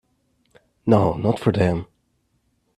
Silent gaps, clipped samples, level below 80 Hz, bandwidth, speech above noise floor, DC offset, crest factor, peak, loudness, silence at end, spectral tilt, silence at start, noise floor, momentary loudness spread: none; under 0.1%; -50 dBFS; 12 kHz; 49 dB; under 0.1%; 22 dB; -2 dBFS; -21 LUFS; 0.95 s; -8.5 dB/octave; 0.85 s; -68 dBFS; 11 LU